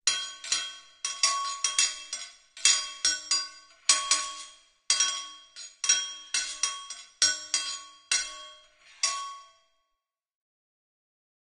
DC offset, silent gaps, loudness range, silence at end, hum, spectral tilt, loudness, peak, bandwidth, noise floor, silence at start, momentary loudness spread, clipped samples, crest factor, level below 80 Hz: under 0.1%; none; 8 LU; 2.1 s; none; 4 dB/octave; -27 LUFS; -6 dBFS; 11 kHz; -84 dBFS; 0.05 s; 18 LU; under 0.1%; 26 dB; -72 dBFS